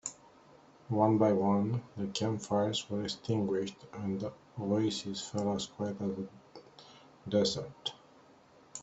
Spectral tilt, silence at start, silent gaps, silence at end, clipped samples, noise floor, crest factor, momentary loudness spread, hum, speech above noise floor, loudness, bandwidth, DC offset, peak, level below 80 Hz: -5.5 dB/octave; 0.05 s; none; 0 s; under 0.1%; -61 dBFS; 20 dB; 14 LU; none; 28 dB; -33 LUFS; 8.2 kHz; under 0.1%; -14 dBFS; -70 dBFS